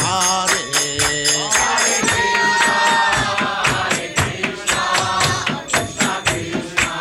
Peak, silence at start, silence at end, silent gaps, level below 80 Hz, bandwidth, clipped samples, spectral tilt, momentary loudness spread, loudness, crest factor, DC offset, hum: -6 dBFS; 0 s; 0 s; none; -42 dBFS; 16.5 kHz; under 0.1%; -1.5 dB/octave; 6 LU; -16 LUFS; 12 dB; under 0.1%; none